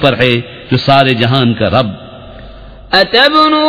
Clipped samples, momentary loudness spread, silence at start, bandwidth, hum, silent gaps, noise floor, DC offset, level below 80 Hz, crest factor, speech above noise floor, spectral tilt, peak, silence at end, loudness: 0.6%; 10 LU; 0 s; 5.4 kHz; none; none; -32 dBFS; under 0.1%; -38 dBFS; 10 dB; 22 dB; -7 dB/octave; 0 dBFS; 0 s; -10 LUFS